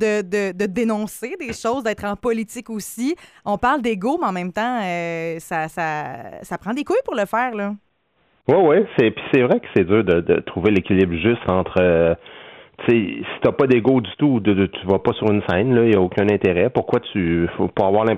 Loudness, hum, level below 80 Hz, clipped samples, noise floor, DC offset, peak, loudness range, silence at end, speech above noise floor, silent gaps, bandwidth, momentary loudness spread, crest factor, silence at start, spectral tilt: -19 LUFS; none; -52 dBFS; under 0.1%; -64 dBFS; under 0.1%; -4 dBFS; 6 LU; 0 s; 45 dB; none; 15.5 kHz; 11 LU; 16 dB; 0 s; -6.5 dB/octave